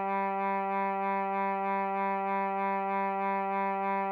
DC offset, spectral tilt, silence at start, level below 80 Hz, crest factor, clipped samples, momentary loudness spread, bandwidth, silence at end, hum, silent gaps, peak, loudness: under 0.1%; -9 dB/octave; 0 s; -84 dBFS; 10 dB; under 0.1%; 0 LU; 16.5 kHz; 0 s; none; none; -22 dBFS; -31 LUFS